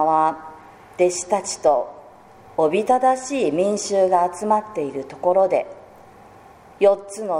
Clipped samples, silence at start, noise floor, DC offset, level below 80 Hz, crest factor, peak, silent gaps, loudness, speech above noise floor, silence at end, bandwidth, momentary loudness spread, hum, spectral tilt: under 0.1%; 0 s; -46 dBFS; under 0.1%; -62 dBFS; 16 dB; -4 dBFS; none; -20 LUFS; 27 dB; 0 s; 15 kHz; 11 LU; none; -4 dB/octave